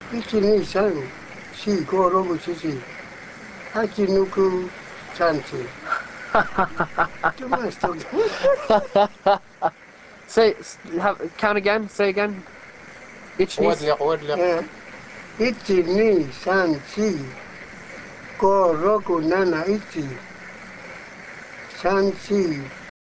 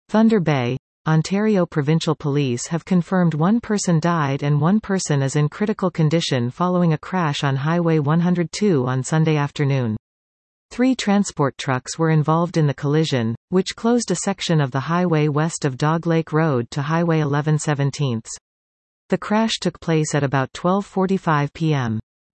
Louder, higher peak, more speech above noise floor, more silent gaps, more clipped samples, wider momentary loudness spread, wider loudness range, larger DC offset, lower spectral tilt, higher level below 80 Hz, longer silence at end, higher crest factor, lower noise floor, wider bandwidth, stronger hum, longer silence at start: about the same, -22 LUFS vs -20 LUFS; about the same, -4 dBFS vs -4 dBFS; second, 25 dB vs over 71 dB; second, none vs 0.79-1.05 s, 9.99-10.69 s, 13.37-13.48 s, 18.41-19.09 s; neither; first, 18 LU vs 4 LU; about the same, 3 LU vs 2 LU; first, 0.2% vs under 0.1%; about the same, -5.5 dB/octave vs -6 dB/octave; about the same, -52 dBFS vs -56 dBFS; second, 0.15 s vs 0.35 s; first, 20 dB vs 14 dB; second, -46 dBFS vs under -90 dBFS; about the same, 8 kHz vs 8.8 kHz; neither; about the same, 0 s vs 0.1 s